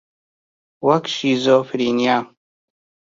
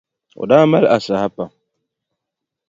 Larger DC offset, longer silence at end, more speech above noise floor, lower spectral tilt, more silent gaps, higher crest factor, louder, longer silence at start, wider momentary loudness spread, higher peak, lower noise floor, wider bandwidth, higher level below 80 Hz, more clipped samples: neither; second, 0.85 s vs 1.2 s; first, over 73 dB vs 67 dB; second, -5 dB/octave vs -7 dB/octave; neither; about the same, 18 dB vs 18 dB; second, -18 LUFS vs -14 LUFS; first, 0.8 s vs 0.4 s; second, 6 LU vs 18 LU; about the same, -2 dBFS vs 0 dBFS; first, under -90 dBFS vs -81 dBFS; about the same, 7.6 kHz vs 7.8 kHz; second, -66 dBFS vs -58 dBFS; neither